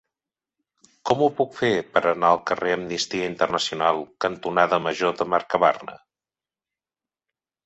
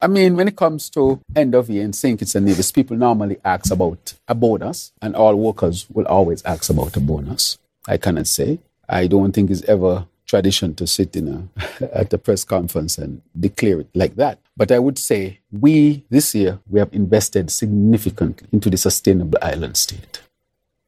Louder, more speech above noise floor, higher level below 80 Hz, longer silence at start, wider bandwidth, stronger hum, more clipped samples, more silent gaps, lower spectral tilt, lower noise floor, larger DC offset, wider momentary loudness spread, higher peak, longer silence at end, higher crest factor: second, -22 LUFS vs -18 LUFS; first, over 68 dB vs 57 dB; second, -64 dBFS vs -40 dBFS; first, 1.05 s vs 0 s; second, 8.2 kHz vs 16 kHz; neither; neither; neither; about the same, -4 dB/octave vs -5 dB/octave; first, under -90 dBFS vs -74 dBFS; neither; second, 6 LU vs 9 LU; about the same, -2 dBFS vs 0 dBFS; first, 1.7 s vs 0.7 s; about the same, 22 dB vs 18 dB